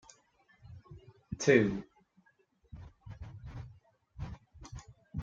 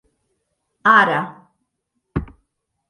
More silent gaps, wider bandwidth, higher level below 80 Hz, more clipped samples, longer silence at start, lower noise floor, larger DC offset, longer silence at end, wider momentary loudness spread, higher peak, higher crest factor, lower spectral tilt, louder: neither; second, 7.8 kHz vs 10.5 kHz; second, -56 dBFS vs -44 dBFS; neither; second, 0.65 s vs 0.85 s; second, -71 dBFS vs -75 dBFS; neither; second, 0 s vs 0.65 s; first, 29 LU vs 16 LU; second, -10 dBFS vs 0 dBFS; first, 28 dB vs 22 dB; about the same, -5.5 dB/octave vs -6 dB/octave; second, -31 LUFS vs -17 LUFS